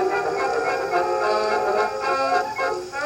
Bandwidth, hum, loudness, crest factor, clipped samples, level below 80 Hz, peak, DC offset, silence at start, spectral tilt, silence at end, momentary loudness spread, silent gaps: 17 kHz; none; -22 LUFS; 14 dB; under 0.1%; -58 dBFS; -8 dBFS; under 0.1%; 0 s; -3.5 dB/octave; 0 s; 3 LU; none